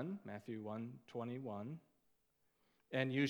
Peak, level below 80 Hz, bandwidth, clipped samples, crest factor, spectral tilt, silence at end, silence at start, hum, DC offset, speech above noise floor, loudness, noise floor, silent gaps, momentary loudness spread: -22 dBFS; under -90 dBFS; over 20 kHz; under 0.1%; 22 dB; -7 dB/octave; 0 s; 0 s; none; under 0.1%; 38 dB; -46 LUFS; -81 dBFS; none; 8 LU